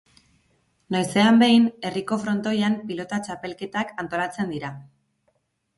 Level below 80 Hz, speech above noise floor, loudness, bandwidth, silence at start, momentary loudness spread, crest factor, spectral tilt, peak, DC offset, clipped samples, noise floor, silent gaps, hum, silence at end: -64 dBFS; 48 dB; -23 LUFS; 11.5 kHz; 0.9 s; 16 LU; 18 dB; -5.5 dB/octave; -6 dBFS; under 0.1%; under 0.1%; -70 dBFS; none; none; 0.95 s